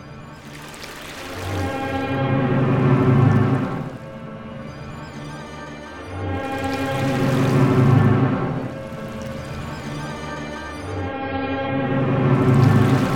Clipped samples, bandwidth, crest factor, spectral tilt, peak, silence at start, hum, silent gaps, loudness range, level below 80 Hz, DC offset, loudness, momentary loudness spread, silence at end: under 0.1%; 15.5 kHz; 16 dB; -7.5 dB/octave; -4 dBFS; 0 s; none; none; 8 LU; -44 dBFS; under 0.1%; -20 LUFS; 19 LU; 0 s